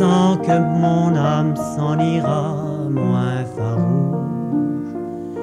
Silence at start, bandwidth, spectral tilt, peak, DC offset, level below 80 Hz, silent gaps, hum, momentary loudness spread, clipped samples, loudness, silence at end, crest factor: 0 s; 11.5 kHz; -8 dB/octave; -6 dBFS; under 0.1%; -54 dBFS; none; none; 7 LU; under 0.1%; -19 LUFS; 0 s; 12 dB